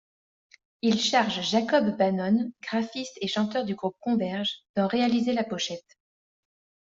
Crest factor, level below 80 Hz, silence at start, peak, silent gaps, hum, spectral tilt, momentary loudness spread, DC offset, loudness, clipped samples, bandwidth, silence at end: 18 dB; -68 dBFS; 0.85 s; -8 dBFS; 4.69-4.74 s; none; -4.5 dB/octave; 8 LU; under 0.1%; -26 LUFS; under 0.1%; 7.8 kHz; 1.15 s